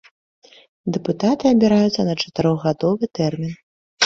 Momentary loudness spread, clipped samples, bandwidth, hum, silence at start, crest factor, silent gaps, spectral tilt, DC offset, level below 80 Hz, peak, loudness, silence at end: 13 LU; under 0.1%; 7.4 kHz; none; 0.85 s; 18 dB; 3.63-3.97 s; -5.5 dB/octave; under 0.1%; -54 dBFS; -2 dBFS; -19 LUFS; 0 s